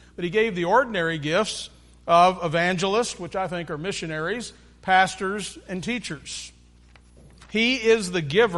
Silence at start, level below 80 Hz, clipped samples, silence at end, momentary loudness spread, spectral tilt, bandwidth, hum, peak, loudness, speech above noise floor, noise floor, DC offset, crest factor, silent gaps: 0.2 s; -52 dBFS; under 0.1%; 0 s; 14 LU; -4 dB/octave; 11.5 kHz; 60 Hz at -50 dBFS; -4 dBFS; -23 LUFS; 29 dB; -52 dBFS; under 0.1%; 20 dB; none